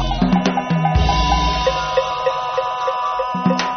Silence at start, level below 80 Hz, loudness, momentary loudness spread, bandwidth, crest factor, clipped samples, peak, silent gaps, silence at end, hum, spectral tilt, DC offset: 0 s; -26 dBFS; -18 LUFS; 4 LU; 6.6 kHz; 14 dB; under 0.1%; -4 dBFS; none; 0 s; none; -4.5 dB/octave; under 0.1%